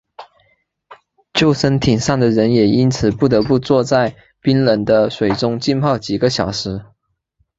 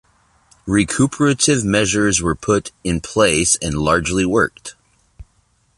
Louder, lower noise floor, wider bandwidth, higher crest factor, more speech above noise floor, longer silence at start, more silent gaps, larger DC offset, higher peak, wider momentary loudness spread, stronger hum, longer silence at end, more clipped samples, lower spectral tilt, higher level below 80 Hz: about the same, -16 LUFS vs -17 LUFS; first, -65 dBFS vs -60 dBFS; second, 8 kHz vs 11.5 kHz; about the same, 16 dB vs 18 dB; first, 50 dB vs 43 dB; second, 0.2 s vs 0.65 s; neither; neither; about the same, 0 dBFS vs 0 dBFS; about the same, 7 LU vs 8 LU; neither; first, 0.75 s vs 0.55 s; neither; first, -6 dB/octave vs -4 dB/octave; about the same, -42 dBFS vs -38 dBFS